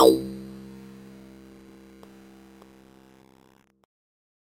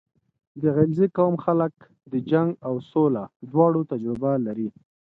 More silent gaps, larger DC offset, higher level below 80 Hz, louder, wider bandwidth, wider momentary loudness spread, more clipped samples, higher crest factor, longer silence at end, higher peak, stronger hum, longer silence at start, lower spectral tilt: second, none vs 3.36-3.40 s; neither; about the same, -60 dBFS vs -62 dBFS; about the same, -26 LUFS vs -24 LUFS; first, 16.5 kHz vs 4.3 kHz; first, 20 LU vs 10 LU; neither; first, 26 dB vs 18 dB; first, 4.1 s vs 0.45 s; about the same, -2 dBFS vs -4 dBFS; neither; second, 0 s vs 0.55 s; second, -5 dB/octave vs -11.5 dB/octave